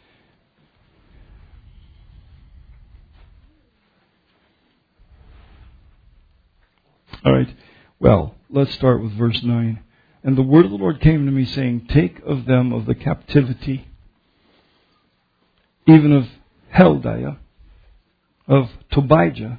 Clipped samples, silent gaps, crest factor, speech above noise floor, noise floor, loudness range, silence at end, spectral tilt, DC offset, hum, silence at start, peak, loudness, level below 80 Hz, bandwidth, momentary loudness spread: under 0.1%; none; 20 dB; 48 dB; -64 dBFS; 6 LU; 0 s; -10.5 dB/octave; under 0.1%; none; 7.15 s; 0 dBFS; -17 LUFS; -40 dBFS; 5 kHz; 13 LU